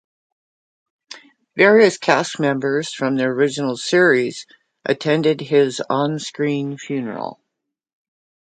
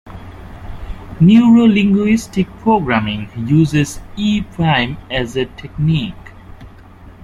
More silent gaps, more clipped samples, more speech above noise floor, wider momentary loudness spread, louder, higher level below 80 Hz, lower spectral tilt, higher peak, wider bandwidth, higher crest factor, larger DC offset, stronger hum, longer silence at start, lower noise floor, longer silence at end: neither; neither; first, 62 dB vs 25 dB; second, 13 LU vs 23 LU; second, -18 LUFS vs -15 LUFS; second, -70 dBFS vs -36 dBFS; second, -5 dB/octave vs -6.5 dB/octave; about the same, 0 dBFS vs -2 dBFS; second, 9.4 kHz vs 12.5 kHz; first, 20 dB vs 14 dB; neither; neither; first, 1.1 s vs 0.05 s; first, -80 dBFS vs -39 dBFS; first, 1.1 s vs 0.15 s